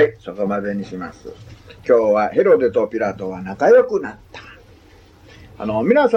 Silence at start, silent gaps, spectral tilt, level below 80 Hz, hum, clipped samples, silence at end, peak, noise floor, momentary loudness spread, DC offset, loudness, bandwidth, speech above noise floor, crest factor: 0 s; none; -7 dB/octave; -52 dBFS; none; under 0.1%; 0 s; -2 dBFS; -47 dBFS; 21 LU; under 0.1%; -17 LUFS; 7 kHz; 30 dB; 16 dB